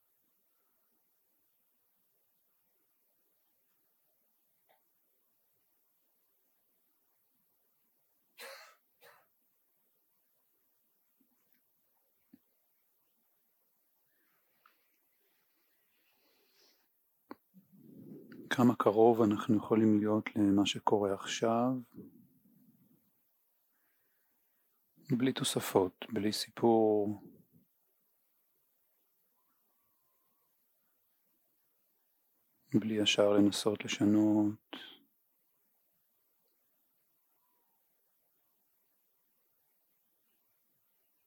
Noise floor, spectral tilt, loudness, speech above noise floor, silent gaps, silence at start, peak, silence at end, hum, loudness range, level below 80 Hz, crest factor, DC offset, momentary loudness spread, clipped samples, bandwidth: -76 dBFS; -5 dB/octave; -31 LUFS; 46 dB; none; 8.4 s; -14 dBFS; 6.35 s; none; 10 LU; -86 dBFS; 24 dB; under 0.1%; 20 LU; under 0.1%; 19 kHz